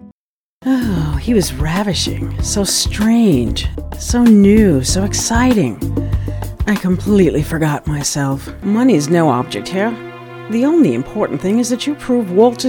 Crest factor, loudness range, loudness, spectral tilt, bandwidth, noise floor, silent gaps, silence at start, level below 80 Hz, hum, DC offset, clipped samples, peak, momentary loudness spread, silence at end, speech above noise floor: 14 dB; 4 LU; -15 LUFS; -5 dB/octave; 19 kHz; under -90 dBFS; 0.12-0.61 s; 0.05 s; -28 dBFS; none; under 0.1%; under 0.1%; 0 dBFS; 9 LU; 0 s; over 76 dB